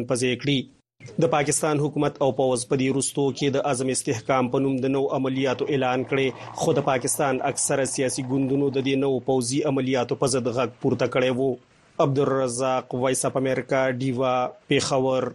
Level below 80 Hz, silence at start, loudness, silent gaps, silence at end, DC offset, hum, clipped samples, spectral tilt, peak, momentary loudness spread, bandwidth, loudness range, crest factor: -60 dBFS; 0 s; -24 LUFS; none; 0 s; under 0.1%; none; under 0.1%; -4.5 dB/octave; -6 dBFS; 3 LU; 12 kHz; 1 LU; 18 dB